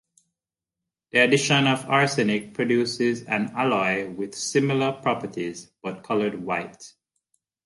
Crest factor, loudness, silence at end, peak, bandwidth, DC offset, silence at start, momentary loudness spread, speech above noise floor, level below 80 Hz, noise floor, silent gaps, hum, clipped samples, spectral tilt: 20 dB; -23 LUFS; 0.75 s; -6 dBFS; 11.5 kHz; under 0.1%; 1.15 s; 13 LU; 64 dB; -66 dBFS; -88 dBFS; none; none; under 0.1%; -4.5 dB/octave